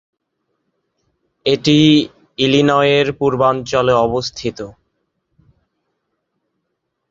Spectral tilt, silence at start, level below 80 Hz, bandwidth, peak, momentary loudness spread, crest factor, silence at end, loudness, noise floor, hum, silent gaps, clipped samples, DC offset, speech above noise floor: -5.5 dB/octave; 1.45 s; -50 dBFS; 7.8 kHz; 0 dBFS; 14 LU; 16 dB; 2.4 s; -15 LUFS; -74 dBFS; none; none; under 0.1%; under 0.1%; 60 dB